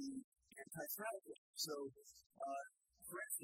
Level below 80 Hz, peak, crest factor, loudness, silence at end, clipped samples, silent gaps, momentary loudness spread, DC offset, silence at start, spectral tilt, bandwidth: -88 dBFS; -30 dBFS; 20 dB; -49 LUFS; 0 s; under 0.1%; 0.24-0.32 s, 1.38-1.54 s, 2.26-2.30 s; 14 LU; under 0.1%; 0 s; -2 dB/octave; 16 kHz